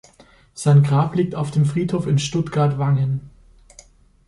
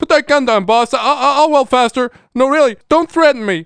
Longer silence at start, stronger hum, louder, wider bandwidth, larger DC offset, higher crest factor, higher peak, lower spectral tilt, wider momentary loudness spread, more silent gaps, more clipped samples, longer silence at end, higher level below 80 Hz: first, 0.55 s vs 0 s; neither; second, -19 LUFS vs -13 LUFS; about the same, 11.5 kHz vs 10.5 kHz; neither; about the same, 16 dB vs 12 dB; second, -4 dBFS vs 0 dBFS; first, -7 dB/octave vs -4 dB/octave; about the same, 7 LU vs 5 LU; neither; neither; first, 1 s vs 0 s; about the same, -50 dBFS vs -50 dBFS